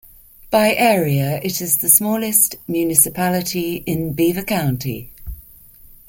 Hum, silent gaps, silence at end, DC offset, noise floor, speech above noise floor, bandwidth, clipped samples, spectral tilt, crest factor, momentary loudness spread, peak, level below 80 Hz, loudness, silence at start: none; none; 0.25 s; under 0.1%; -44 dBFS; 27 dB; 17 kHz; under 0.1%; -4 dB/octave; 18 dB; 12 LU; 0 dBFS; -44 dBFS; -16 LUFS; 0.45 s